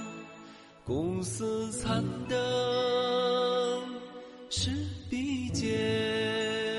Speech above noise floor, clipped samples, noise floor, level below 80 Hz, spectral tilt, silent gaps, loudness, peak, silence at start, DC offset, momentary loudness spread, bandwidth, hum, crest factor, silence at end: 21 dB; under 0.1%; -51 dBFS; -54 dBFS; -4.5 dB/octave; none; -31 LUFS; -18 dBFS; 0 s; under 0.1%; 17 LU; 11.5 kHz; none; 14 dB; 0 s